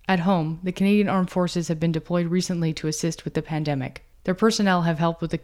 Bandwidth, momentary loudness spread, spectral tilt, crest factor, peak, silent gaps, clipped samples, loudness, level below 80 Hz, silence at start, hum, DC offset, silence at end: 13 kHz; 8 LU; -6 dB/octave; 16 dB; -8 dBFS; none; under 0.1%; -24 LUFS; -50 dBFS; 0.1 s; none; under 0.1%; 0 s